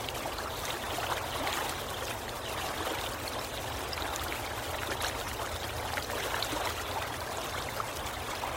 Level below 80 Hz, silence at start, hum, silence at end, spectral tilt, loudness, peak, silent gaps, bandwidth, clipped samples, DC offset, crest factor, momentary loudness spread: -48 dBFS; 0 s; none; 0 s; -2.5 dB/octave; -34 LUFS; -16 dBFS; none; 16 kHz; under 0.1%; under 0.1%; 20 dB; 4 LU